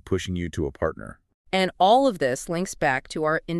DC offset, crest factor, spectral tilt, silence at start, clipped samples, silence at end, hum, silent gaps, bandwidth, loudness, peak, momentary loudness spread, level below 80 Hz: under 0.1%; 18 dB; -5 dB/octave; 0.05 s; under 0.1%; 0 s; none; 1.34-1.45 s; 13 kHz; -24 LUFS; -8 dBFS; 11 LU; -48 dBFS